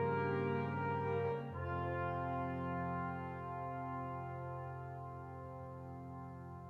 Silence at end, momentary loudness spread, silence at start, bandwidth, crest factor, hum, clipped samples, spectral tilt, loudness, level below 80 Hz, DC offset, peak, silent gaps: 0 s; 12 LU; 0 s; 5.8 kHz; 14 dB; none; under 0.1%; -9.5 dB/octave; -42 LUFS; -70 dBFS; under 0.1%; -26 dBFS; none